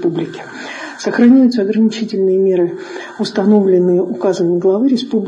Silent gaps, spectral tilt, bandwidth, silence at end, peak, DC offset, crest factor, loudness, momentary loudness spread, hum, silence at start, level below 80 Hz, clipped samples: none; -7 dB/octave; 9.8 kHz; 0 s; 0 dBFS; under 0.1%; 12 dB; -13 LUFS; 16 LU; none; 0 s; -62 dBFS; under 0.1%